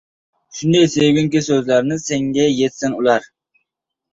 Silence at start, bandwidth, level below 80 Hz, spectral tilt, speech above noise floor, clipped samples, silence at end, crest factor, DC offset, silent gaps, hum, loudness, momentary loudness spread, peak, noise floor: 0.55 s; 8 kHz; -54 dBFS; -5 dB/octave; 62 dB; under 0.1%; 0.9 s; 16 dB; under 0.1%; none; none; -16 LUFS; 6 LU; -2 dBFS; -78 dBFS